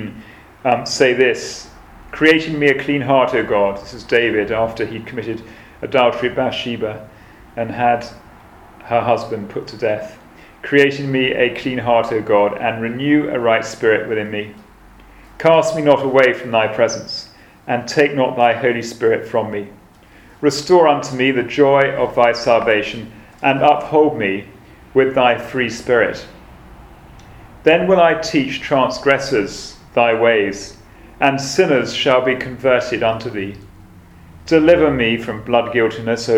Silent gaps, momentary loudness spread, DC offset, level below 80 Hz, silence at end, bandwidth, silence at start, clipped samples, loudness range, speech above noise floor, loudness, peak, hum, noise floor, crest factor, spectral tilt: none; 13 LU; under 0.1%; -46 dBFS; 0 s; 14.5 kHz; 0 s; under 0.1%; 5 LU; 29 dB; -16 LUFS; 0 dBFS; none; -45 dBFS; 16 dB; -5 dB/octave